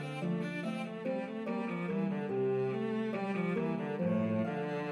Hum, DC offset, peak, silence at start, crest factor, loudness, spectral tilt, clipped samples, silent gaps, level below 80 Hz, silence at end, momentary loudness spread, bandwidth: none; under 0.1%; -22 dBFS; 0 s; 12 dB; -35 LUFS; -8 dB/octave; under 0.1%; none; -82 dBFS; 0 s; 5 LU; 11 kHz